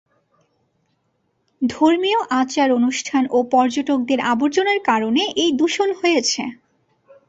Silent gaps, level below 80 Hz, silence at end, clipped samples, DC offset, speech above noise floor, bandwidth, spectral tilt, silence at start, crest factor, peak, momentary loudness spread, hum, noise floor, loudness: none; -64 dBFS; 0.75 s; under 0.1%; under 0.1%; 50 dB; 8 kHz; -3 dB/octave; 1.6 s; 16 dB; -2 dBFS; 4 LU; none; -68 dBFS; -18 LUFS